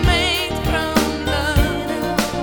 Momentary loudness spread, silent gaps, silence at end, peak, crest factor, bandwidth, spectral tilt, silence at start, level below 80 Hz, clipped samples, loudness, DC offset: 4 LU; none; 0 s; -2 dBFS; 18 dB; over 20 kHz; -4.5 dB/octave; 0 s; -26 dBFS; under 0.1%; -19 LUFS; under 0.1%